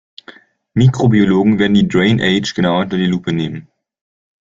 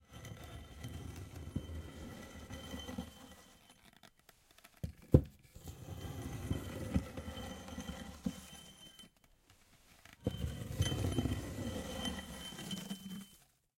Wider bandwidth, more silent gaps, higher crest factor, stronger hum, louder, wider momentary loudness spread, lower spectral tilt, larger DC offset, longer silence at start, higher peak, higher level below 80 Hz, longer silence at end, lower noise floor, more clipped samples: second, 7.6 kHz vs 16.5 kHz; neither; second, 14 dB vs 32 dB; neither; first, -14 LUFS vs -42 LUFS; second, 9 LU vs 22 LU; about the same, -6.5 dB/octave vs -5.5 dB/octave; neither; first, 0.3 s vs 0.1 s; first, -2 dBFS vs -10 dBFS; first, -46 dBFS vs -52 dBFS; first, 0.95 s vs 0.4 s; second, -42 dBFS vs -68 dBFS; neither